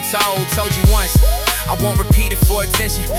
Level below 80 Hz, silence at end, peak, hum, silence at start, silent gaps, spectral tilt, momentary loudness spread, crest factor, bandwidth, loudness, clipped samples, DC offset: -18 dBFS; 0 s; -2 dBFS; none; 0 s; none; -4 dB/octave; 4 LU; 14 dB; 17 kHz; -15 LUFS; under 0.1%; under 0.1%